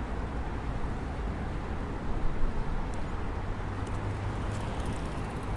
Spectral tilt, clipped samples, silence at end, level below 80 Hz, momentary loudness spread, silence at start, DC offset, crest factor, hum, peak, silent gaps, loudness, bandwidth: -7 dB/octave; under 0.1%; 0 s; -34 dBFS; 2 LU; 0 s; under 0.1%; 16 dB; none; -16 dBFS; none; -36 LUFS; 11.5 kHz